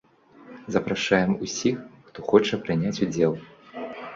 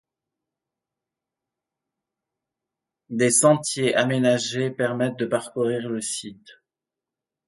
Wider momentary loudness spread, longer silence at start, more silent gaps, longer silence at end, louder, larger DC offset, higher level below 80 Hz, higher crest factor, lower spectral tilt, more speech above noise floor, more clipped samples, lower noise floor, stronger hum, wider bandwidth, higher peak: first, 16 LU vs 11 LU; second, 0.4 s vs 3.1 s; neither; second, 0 s vs 0.95 s; about the same, -24 LUFS vs -22 LUFS; neither; first, -58 dBFS vs -70 dBFS; about the same, 22 dB vs 22 dB; about the same, -5 dB/octave vs -4 dB/octave; second, 27 dB vs 66 dB; neither; second, -50 dBFS vs -88 dBFS; neither; second, 7.8 kHz vs 11.5 kHz; about the same, -4 dBFS vs -4 dBFS